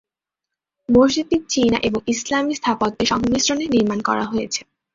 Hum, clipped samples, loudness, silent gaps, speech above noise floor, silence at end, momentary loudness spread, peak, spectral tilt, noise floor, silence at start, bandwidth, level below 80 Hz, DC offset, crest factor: none; under 0.1%; -19 LUFS; none; 66 dB; 0.35 s; 7 LU; -2 dBFS; -3.5 dB/octave; -85 dBFS; 0.9 s; 7.8 kHz; -46 dBFS; under 0.1%; 18 dB